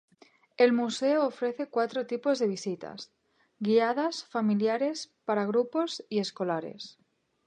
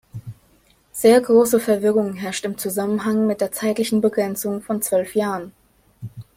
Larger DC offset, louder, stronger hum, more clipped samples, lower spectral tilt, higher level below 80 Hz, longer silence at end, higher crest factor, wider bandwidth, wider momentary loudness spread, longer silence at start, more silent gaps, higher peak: neither; second, -29 LUFS vs -20 LUFS; neither; neither; about the same, -5 dB/octave vs -5 dB/octave; second, -82 dBFS vs -60 dBFS; first, 0.55 s vs 0.15 s; about the same, 20 dB vs 18 dB; second, 9.8 kHz vs 16.5 kHz; second, 13 LU vs 21 LU; first, 0.6 s vs 0.15 s; neither; second, -10 dBFS vs -4 dBFS